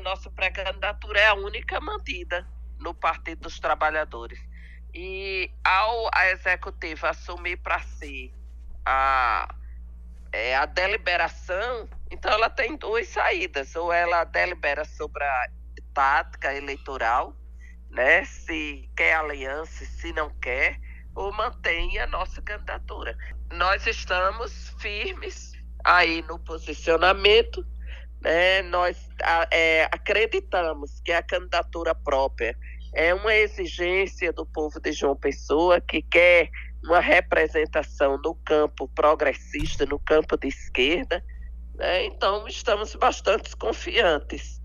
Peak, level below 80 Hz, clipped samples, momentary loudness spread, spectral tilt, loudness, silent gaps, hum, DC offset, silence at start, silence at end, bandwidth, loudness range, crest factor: -4 dBFS; -38 dBFS; under 0.1%; 16 LU; -4 dB/octave; -24 LUFS; none; none; under 0.1%; 0 s; 0 s; 11 kHz; 7 LU; 22 dB